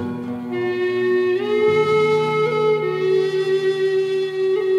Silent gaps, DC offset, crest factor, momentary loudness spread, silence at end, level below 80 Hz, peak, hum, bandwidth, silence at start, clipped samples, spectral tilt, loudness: none; under 0.1%; 12 dB; 6 LU; 0 s; -66 dBFS; -8 dBFS; none; 10.5 kHz; 0 s; under 0.1%; -6.5 dB/octave; -19 LUFS